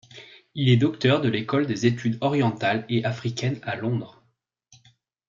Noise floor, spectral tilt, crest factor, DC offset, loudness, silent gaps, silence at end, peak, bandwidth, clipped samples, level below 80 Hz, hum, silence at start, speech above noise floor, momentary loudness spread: -70 dBFS; -6.5 dB/octave; 18 dB; under 0.1%; -24 LUFS; none; 1.2 s; -6 dBFS; 7.6 kHz; under 0.1%; -64 dBFS; none; 0.15 s; 47 dB; 11 LU